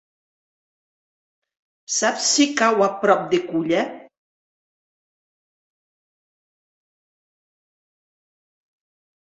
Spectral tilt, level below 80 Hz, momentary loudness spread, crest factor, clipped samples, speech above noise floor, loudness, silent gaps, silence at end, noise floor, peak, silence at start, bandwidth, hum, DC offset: -2.5 dB/octave; -72 dBFS; 6 LU; 22 dB; under 0.1%; over 71 dB; -19 LUFS; none; 5.35 s; under -90 dBFS; -2 dBFS; 1.9 s; 8.4 kHz; none; under 0.1%